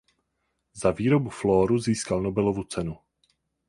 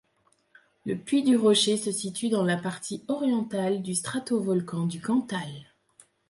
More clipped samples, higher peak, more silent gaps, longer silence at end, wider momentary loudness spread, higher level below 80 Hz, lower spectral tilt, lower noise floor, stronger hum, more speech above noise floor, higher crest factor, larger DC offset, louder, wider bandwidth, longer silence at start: neither; first, -6 dBFS vs -10 dBFS; neither; about the same, 0.7 s vs 0.65 s; second, 10 LU vs 13 LU; first, -50 dBFS vs -70 dBFS; first, -6.5 dB/octave vs -4.5 dB/octave; first, -77 dBFS vs -68 dBFS; neither; first, 53 dB vs 42 dB; about the same, 20 dB vs 16 dB; neither; about the same, -25 LUFS vs -27 LUFS; about the same, 11.5 kHz vs 11.5 kHz; about the same, 0.75 s vs 0.85 s